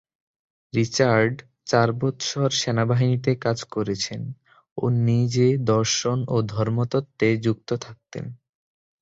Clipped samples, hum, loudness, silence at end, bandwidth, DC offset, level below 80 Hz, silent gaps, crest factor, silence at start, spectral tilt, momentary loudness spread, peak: under 0.1%; none; -23 LUFS; 0.65 s; 7.8 kHz; under 0.1%; -56 dBFS; 4.72-4.76 s; 18 dB; 0.75 s; -5.5 dB/octave; 15 LU; -4 dBFS